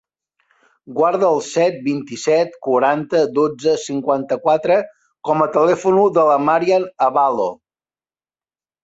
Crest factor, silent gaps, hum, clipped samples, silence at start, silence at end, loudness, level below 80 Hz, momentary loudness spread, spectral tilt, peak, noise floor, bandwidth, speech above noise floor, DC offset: 16 dB; none; none; under 0.1%; 0.9 s; 1.3 s; -17 LUFS; -66 dBFS; 8 LU; -5.5 dB/octave; -2 dBFS; under -90 dBFS; 8.2 kHz; over 74 dB; under 0.1%